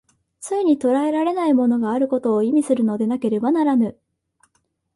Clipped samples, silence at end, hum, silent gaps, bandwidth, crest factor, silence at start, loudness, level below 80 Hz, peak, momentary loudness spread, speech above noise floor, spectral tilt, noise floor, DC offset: under 0.1%; 1.05 s; none; none; 11.5 kHz; 14 dB; 0.4 s; -19 LUFS; -66 dBFS; -6 dBFS; 4 LU; 50 dB; -6.5 dB/octave; -68 dBFS; under 0.1%